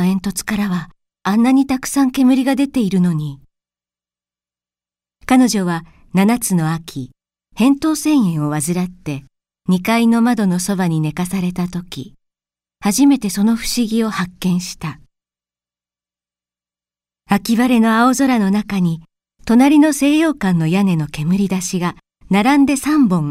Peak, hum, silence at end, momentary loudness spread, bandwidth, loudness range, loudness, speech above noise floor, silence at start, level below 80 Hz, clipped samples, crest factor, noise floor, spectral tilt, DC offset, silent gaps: 0 dBFS; 60 Hz at -40 dBFS; 0 s; 12 LU; 16 kHz; 6 LU; -16 LUFS; over 75 dB; 0 s; -46 dBFS; under 0.1%; 16 dB; under -90 dBFS; -5.5 dB/octave; under 0.1%; none